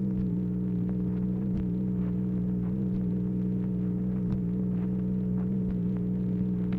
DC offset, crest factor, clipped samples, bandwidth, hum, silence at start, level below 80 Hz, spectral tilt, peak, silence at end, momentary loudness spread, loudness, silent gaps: under 0.1%; 12 dB; under 0.1%; 2.9 kHz; none; 0 s; -44 dBFS; -12 dB/octave; -18 dBFS; 0 s; 1 LU; -30 LUFS; none